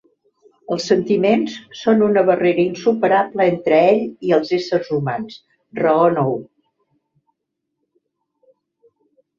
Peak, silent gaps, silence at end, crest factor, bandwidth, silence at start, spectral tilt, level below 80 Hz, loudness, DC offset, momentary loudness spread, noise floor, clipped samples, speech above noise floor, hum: -2 dBFS; none; 2.95 s; 16 dB; 7.6 kHz; 0.7 s; -6.5 dB/octave; -62 dBFS; -17 LUFS; under 0.1%; 10 LU; -77 dBFS; under 0.1%; 61 dB; none